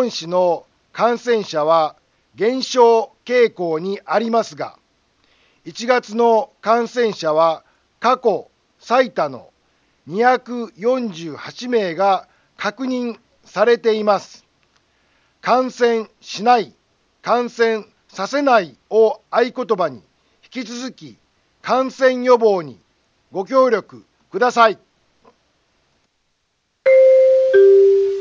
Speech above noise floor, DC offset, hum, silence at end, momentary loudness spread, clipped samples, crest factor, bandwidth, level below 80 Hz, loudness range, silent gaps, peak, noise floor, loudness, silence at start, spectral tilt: 51 dB; under 0.1%; none; 0 s; 16 LU; under 0.1%; 18 dB; 7.4 kHz; -70 dBFS; 4 LU; none; 0 dBFS; -68 dBFS; -17 LUFS; 0 s; -4.5 dB/octave